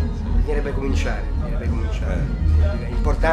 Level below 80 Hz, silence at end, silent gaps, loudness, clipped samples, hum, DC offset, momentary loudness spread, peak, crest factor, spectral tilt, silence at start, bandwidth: -22 dBFS; 0 s; none; -23 LUFS; under 0.1%; none; under 0.1%; 5 LU; -6 dBFS; 14 dB; -7.5 dB/octave; 0 s; 8.2 kHz